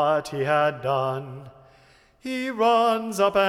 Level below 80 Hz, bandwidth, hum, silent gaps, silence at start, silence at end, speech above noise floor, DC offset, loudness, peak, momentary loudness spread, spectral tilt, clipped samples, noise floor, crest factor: -62 dBFS; 16 kHz; none; none; 0 s; 0 s; 33 dB; under 0.1%; -23 LUFS; -8 dBFS; 16 LU; -5 dB/octave; under 0.1%; -56 dBFS; 16 dB